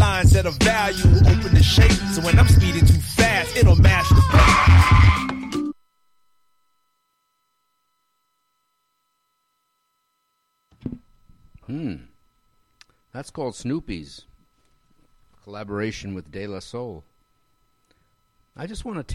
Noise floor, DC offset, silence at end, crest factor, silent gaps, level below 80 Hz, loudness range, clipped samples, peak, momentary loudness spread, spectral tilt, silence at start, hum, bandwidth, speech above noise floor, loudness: -72 dBFS; under 0.1%; 0 s; 14 dB; none; -26 dBFS; 23 LU; under 0.1%; -4 dBFS; 22 LU; -5.5 dB/octave; 0 s; 60 Hz at -50 dBFS; 14.5 kHz; 54 dB; -17 LUFS